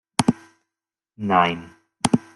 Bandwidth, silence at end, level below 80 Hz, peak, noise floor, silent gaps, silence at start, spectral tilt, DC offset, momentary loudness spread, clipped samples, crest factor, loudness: 12 kHz; 0.15 s; -54 dBFS; 0 dBFS; -87 dBFS; none; 0.2 s; -4.5 dB/octave; under 0.1%; 14 LU; under 0.1%; 22 dB; -22 LUFS